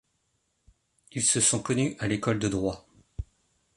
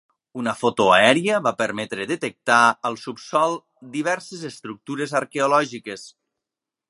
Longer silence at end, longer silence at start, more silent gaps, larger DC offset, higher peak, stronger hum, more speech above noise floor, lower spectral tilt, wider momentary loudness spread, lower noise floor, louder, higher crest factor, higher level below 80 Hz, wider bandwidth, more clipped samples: second, 0.55 s vs 0.8 s; first, 1.15 s vs 0.35 s; neither; neither; second, -10 dBFS vs 0 dBFS; neither; second, 48 dB vs 65 dB; about the same, -3.5 dB/octave vs -4 dB/octave; first, 21 LU vs 17 LU; second, -75 dBFS vs -87 dBFS; second, -26 LUFS vs -20 LUFS; about the same, 20 dB vs 22 dB; first, -50 dBFS vs -66 dBFS; about the same, 11.5 kHz vs 11.5 kHz; neither